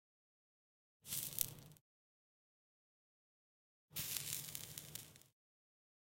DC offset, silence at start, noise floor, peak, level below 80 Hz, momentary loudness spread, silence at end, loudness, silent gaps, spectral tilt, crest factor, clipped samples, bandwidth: under 0.1%; 1.05 s; under -90 dBFS; -8 dBFS; -78 dBFS; 19 LU; 0.8 s; -44 LUFS; 1.81-3.88 s; -1 dB/octave; 44 dB; under 0.1%; 17 kHz